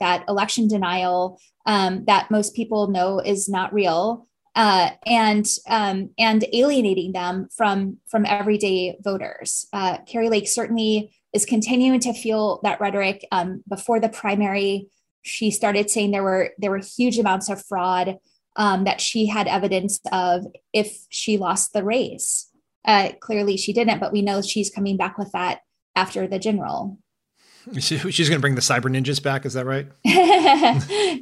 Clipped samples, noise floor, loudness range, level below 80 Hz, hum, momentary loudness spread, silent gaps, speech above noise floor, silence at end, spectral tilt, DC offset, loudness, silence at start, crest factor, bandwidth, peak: under 0.1%; -62 dBFS; 4 LU; -64 dBFS; none; 8 LU; 15.11-15.22 s, 22.76-22.82 s, 25.82-25.94 s; 41 dB; 0 s; -4 dB/octave; under 0.1%; -21 LUFS; 0 s; 18 dB; 13.5 kHz; -2 dBFS